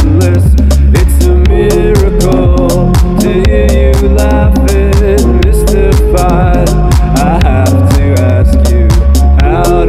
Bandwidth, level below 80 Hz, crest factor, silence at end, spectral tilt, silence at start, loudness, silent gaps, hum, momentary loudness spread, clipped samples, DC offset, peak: 15 kHz; -8 dBFS; 6 dB; 0 s; -7 dB/octave; 0 s; -8 LUFS; none; none; 1 LU; under 0.1%; under 0.1%; 0 dBFS